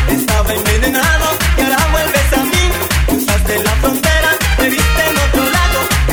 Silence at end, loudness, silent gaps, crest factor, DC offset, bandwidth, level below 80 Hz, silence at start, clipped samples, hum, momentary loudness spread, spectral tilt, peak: 0 s; -13 LUFS; none; 12 dB; 0.2%; over 20 kHz; -16 dBFS; 0 s; under 0.1%; none; 2 LU; -4 dB/octave; 0 dBFS